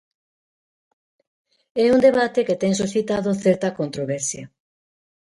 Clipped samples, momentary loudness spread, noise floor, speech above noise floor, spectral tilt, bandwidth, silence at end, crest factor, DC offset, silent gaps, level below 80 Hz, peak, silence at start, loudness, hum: under 0.1%; 11 LU; under -90 dBFS; over 70 dB; -5 dB/octave; 11.5 kHz; 0.75 s; 18 dB; under 0.1%; none; -60 dBFS; -4 dBFS; 1.75 s; -20 LUFS; none